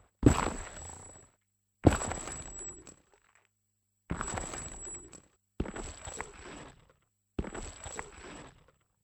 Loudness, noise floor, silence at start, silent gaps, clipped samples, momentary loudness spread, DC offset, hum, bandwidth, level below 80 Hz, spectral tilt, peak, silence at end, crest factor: -35 LUFS; -80 dBFS; 0.2 s; none; under 0.1%; 23 LU; under 0.1%; none; 16.5 kHz; -46 dBFS; -5.5 dB/octave; -6 dBFS; 0.55 s; 30 dB